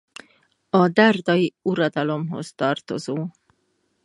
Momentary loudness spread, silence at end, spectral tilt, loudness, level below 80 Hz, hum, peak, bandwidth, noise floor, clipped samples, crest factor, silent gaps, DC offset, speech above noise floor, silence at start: 13 LU; 0.75 s; -6.5 dB/octave; -21 LUFS; -70 dBFS; none; -2 dBFS; 11.5 kHz; -69 dBFS; under 0.1%; 20 dB; none; under 0.1%; 49 dB; 0.75 s